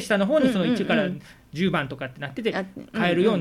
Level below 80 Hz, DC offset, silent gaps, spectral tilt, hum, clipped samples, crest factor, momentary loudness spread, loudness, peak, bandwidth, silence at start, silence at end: -56 dBFS; under 0.1%; none; -6 dB/octave; none; under 0.1%; 16 dB; 12 LU; -24 LUFS; -8 dBFS; 14.5 kHz; 0 s; 0 s